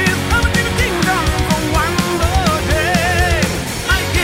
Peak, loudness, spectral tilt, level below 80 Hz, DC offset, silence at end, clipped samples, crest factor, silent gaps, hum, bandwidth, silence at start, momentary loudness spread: -4 dBFS; -15 LUFS; -4 dB/octave; -22 dBFS; under 0.1%; 0 s; under 0.1%; 12 dB; none; none; 16.5 kHz; 0 s; 2 LU